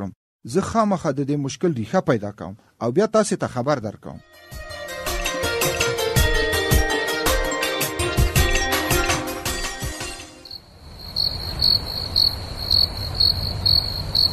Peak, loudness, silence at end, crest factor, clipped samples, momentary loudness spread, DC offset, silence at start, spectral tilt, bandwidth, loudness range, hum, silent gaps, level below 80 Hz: -6 dBFS; -21 LUFS; 0 s; 16 dB; under 0.1%; 17 LU; under 0.1%; 0 s; -3.5 dB/octave; 14 kHz; 5 LU; none; 0.16-0.39 s; -32 dBFS